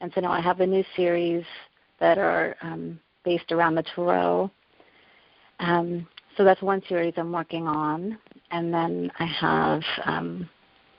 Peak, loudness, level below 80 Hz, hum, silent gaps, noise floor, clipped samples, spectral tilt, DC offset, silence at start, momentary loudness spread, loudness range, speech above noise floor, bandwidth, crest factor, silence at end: -6 dBFS; -25 LUFS; -64 dBFS; none; none; -58 dBFS; under 0.1%; -4 dB/octave; under 0.1%; 0 s; 13 LU; 2 LU; 34 dB; 5.4 kHz; 20 dB; 0.5 s